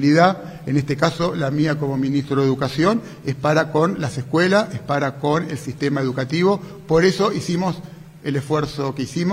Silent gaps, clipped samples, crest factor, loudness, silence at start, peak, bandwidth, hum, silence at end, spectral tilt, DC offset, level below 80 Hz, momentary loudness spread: none; under 0.1%; 18 dB; -20 LUFS; 0 s; 0 dBFS; 15.5 kHz; none; 0 s; -6.5 dB/octave; under 0.1%; -50 dBFS; 9 LU